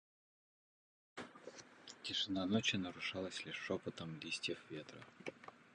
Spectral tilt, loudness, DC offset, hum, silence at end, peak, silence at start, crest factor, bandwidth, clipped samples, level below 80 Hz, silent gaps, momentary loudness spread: -4 dB/octave; -42 LUFS; under 0.1%; none; 0 s; -22 dBFS; 1.15 s; 24 dB; 10 kHz; under 0.1%; -74 dBFS; none; 19 LU